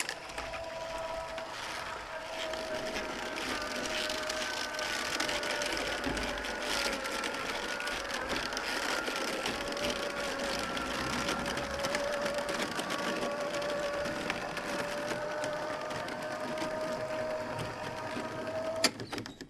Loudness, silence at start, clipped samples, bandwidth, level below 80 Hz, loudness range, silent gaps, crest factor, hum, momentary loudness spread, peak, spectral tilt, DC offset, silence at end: -34 LUFS; 0 s; under 0.1%; 15 kHz; -56 dBFS; 3 LU; none; 24 dB; none; 6 LU; -10 dBFS; -2.5 dB/octave; under 0.1%; 0 s